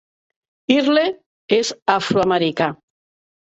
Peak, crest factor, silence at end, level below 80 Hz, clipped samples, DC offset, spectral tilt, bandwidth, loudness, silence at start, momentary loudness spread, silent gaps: -2 dBFS; 18 dB; 0.75 s; -58 dBFS; under 0.1%; under 0.1%; -4.5 dB/octave; 8.2 kHz; -18 LUFS; 0.7 s; 8 LU; 1.26-1.48 s, 1.82-1.86 s